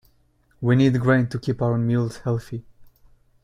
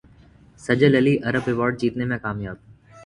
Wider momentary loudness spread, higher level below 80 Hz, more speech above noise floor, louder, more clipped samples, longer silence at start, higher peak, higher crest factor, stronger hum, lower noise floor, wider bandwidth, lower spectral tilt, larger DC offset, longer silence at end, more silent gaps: second, 10 LU vs 18 LU; about the same, -52 dBFS vs -52 dBFS; first, 40 dB vs 30 dB; about the same, -22 LUFS vs -21 LUFS; neither; about the same, 0.6 s vs 0.6 s; second, -6 dBFS vs -2 dBFS; about the same, 18 dB vs 20 dB; neither; first, -61 dBFS vs -51 dBFS; about the same, 10.5 kHz vs 11 kHz; about the same, -8 dB/octave vs -7.5 dB/octave; neither; first, 0.6 s vs 0 s; neither